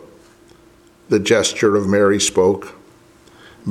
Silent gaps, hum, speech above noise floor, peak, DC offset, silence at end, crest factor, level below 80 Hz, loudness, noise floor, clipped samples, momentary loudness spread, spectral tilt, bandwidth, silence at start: none; none; 34 dB; -2 dBFS; under 0.1%; 0 s; 18 dB; -56 dBFS; -16 LUFS; -49 dBFS; under 0.1%; 11 LU; -4 dB/octave; 15 kHz; 1.1 s